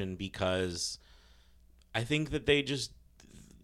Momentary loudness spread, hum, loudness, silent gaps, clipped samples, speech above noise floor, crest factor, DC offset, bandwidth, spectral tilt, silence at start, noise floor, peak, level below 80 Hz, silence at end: 10 LU; none; -33 LUFS; none; under 0.1%; 28 dB; 22 dB; under 0.1%; 14 kHz; -4 dB/octave; 0 s; -61 dBFS; -14 dBFS; -54 dBFS; 0.1 s